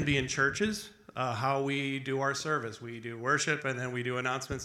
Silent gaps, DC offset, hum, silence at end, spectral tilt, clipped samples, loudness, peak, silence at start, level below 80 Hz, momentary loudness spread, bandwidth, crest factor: none; under 0.1%; none; 0 s; -4 dB/octave; under 0.1%; -32 LUFS; -14 dBFS; 0 s; -58 dBFS; 11 LU; 14 kHz; 18 dB